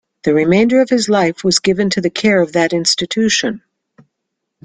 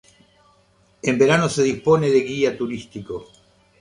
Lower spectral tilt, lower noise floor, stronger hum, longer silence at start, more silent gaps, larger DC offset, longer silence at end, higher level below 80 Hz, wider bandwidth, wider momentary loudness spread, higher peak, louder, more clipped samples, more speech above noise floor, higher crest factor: second, -4 dB/octave vs -5.5 dB/octave; first, -75 dBFS vs -58 dBFS; neither; second, 0.25 s vs 1.05 s; neither; neither; first, 1.05 s vs 0.6 s; about the same, -52 dBFS vs -56 dBFS; second, 9.6 kHz vs 11 kHz; second, 4 LU vs 16 LU; first, 0 dBFS vs -4 dBFS; first, -14 LUFS vs -19 LUFS; neither; first, 62 dB vs 39 dB; about the same, 14 dB vs 18 dB